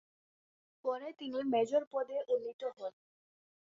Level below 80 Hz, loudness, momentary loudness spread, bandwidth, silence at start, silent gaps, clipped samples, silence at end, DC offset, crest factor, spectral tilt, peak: -84 dBFS; -37 LUFS; 10 LU; 7.6 kHz; 0.85 s; 1.87-1.91 s, 2.53-2.59 s; under 0.1%; 0.85 s; under 0.1%; 18 dB; -3 dB/octave; -20 dBFS